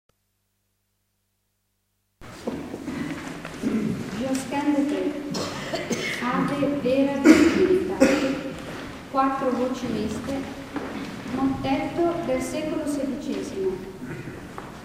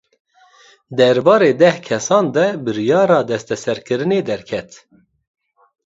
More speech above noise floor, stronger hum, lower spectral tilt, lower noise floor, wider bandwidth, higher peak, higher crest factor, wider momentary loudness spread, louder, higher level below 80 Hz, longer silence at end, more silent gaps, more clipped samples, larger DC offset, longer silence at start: first, 50 dB vs 34 dB; first, 50 Hz at -60 dBFS vs none; about the same, -5.5 dB/octave vs -5 dB/octave; first, -73 dBFS vs -49 dBFS; first, 16 kHz vs 8 kHz; about the same, -2 dBFS vs 0 dBFS; first, 24 dB vs 16 dB; first, 15 LU vs 11 LU; second, -25 LUFS vs -16 LUFS; first, -50 dBFS vs -60 dBFS; second, 0 s vs 1.2 s; neither; neither; neither; first, 2.2 s vs 0.9 s